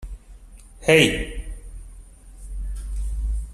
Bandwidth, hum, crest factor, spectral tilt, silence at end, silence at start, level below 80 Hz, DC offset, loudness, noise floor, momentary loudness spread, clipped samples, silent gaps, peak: 13.5 kHz; none; 22 dB; -4.5 dB/octave; 0 s; 0 s; -30 dBFS; under 0.1%; -21 LUFS; -44 dBFS; 27 LU; under 0.1%; none; -2 dBFS